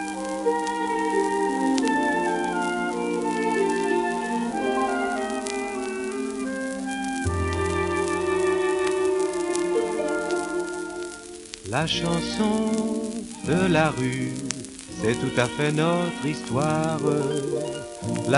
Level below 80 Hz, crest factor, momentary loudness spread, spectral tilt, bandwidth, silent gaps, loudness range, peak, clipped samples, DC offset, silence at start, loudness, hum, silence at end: -50 dBFS; 22 dB; 7 LU; -5 dB/octave; 11.5 kHz; none; 3 LU; -2 dBFS; under 0.1%; under 0.1%; 0 s; -25 LUFS; none; 0 s